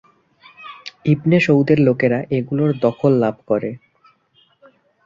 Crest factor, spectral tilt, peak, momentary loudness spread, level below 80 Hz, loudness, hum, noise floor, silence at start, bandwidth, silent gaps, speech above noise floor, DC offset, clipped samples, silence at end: 18 dB; -8.5 dB/octave; -2 dBFS; 20 LU; -56 dBFS; -17 LUFS; none; -58 dBFS; 0.6 s; 7.4 kHz; none; 42 dB; under 0.1%; under 0.1%; 1.3 s